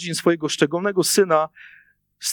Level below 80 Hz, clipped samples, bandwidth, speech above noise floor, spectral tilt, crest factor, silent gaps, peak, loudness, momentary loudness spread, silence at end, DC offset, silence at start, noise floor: -72 dBFS; under 0.1%; 19 kHz; 21 dB; -3.5 dB/octave; 20 dB; none; -2 dBFS; -20 LUFS; 7 LU; 0 s; under 0.1%; 0 s; -41 dBFS